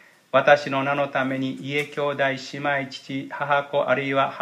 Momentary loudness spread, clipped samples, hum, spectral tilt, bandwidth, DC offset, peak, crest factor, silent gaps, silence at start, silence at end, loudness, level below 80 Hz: 10 LU; under 0.1%; none; -5.5 dB/octave; 13 kHz; under 0.1%; -2 dBFS; 22 dB; none; 0.35 s; 0 s; -23 LUFS; -74 dBFS